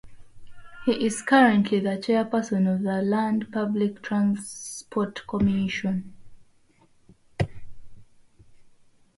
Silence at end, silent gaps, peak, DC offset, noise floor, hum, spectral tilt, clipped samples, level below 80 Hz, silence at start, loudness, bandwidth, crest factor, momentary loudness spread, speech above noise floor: 0.5 s; none; -6 dBFS; under 0.1%; -59 dBFS; none; -6 dB/octave; under 0.1%; -52 dBFS; 0.05 s; -25 LUFS; 11.5 kHz; 20 dB; 12 LU; 35 dB